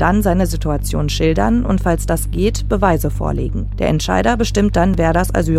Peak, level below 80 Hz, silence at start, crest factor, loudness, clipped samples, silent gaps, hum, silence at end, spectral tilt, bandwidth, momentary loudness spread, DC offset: 0 dBFS; -22 dBFS; 0 s; 16 dB; -17 LUFS; under 0.1%; none; none; 0 s; -6 dB/octave; 15.5 kHz; 5 LU; under 0.1%